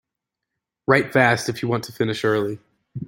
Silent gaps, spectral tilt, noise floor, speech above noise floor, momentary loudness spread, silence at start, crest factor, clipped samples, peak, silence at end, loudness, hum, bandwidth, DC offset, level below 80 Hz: none; -5.5 dB/octave; -84 dBFS; 63 dB; 13 LU; 0.9 s; 22 dB; under 0.1%; 0 dBFS; 0 s; -21 LUFS; none; 16.5 kHz; under 0.1%; -62 dBFS